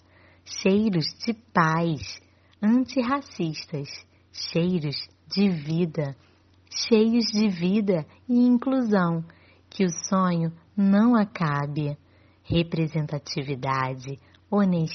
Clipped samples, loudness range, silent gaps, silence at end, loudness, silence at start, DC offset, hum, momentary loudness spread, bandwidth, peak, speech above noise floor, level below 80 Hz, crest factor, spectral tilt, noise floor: under 0.1%; 5 LU; none; 0 s; -25 LUFS; 0.45 s; under 0.1%; none; 13 LU; 6.4 kHz; -4 dBFS; 29 dB; -56 dBFS; 20 dB; -5.5 dB/octave; -53 dBFS